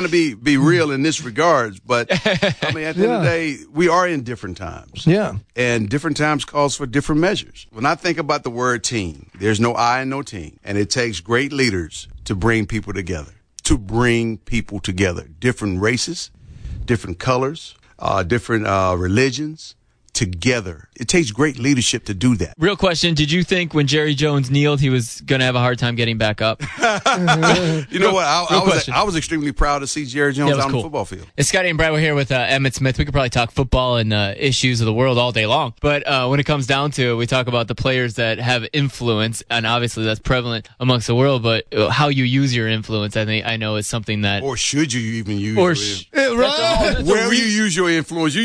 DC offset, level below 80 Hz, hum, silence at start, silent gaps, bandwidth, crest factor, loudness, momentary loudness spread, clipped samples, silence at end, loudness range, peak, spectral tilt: under 0.1%; -36 dBFS; none; 0 s; none; 11 kHz; 14 dB; -18 LUFS; 8 LU; under 0.1%; 0 s; 4 LU; -4 dBFS; -4.5 dB/octave